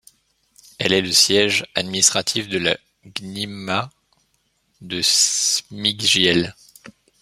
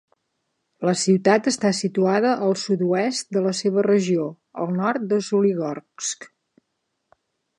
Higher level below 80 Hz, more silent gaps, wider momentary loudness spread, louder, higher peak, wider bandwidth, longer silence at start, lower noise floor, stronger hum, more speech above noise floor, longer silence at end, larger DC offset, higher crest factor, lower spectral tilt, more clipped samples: first, -60 dBFS vs -72 dBFS; neither; first, 15 LU vs 10 LU; first, -17 LUFS vs -22 LUFS; about the same, 0 dBFS vs -2 dBFS; first, 16 kHz vs 11 kHz; about the same, 0.8 s vs 0.8 s; second, -67 dBFS vs -76 dBFS; neither; second, 47 dB vs 55 dB; second, 0.3 s vs 1.3 s; neither; about the same, 20 dB vs 20 dB; second, -1.5 dB/octave vs -5 dB/octave; neither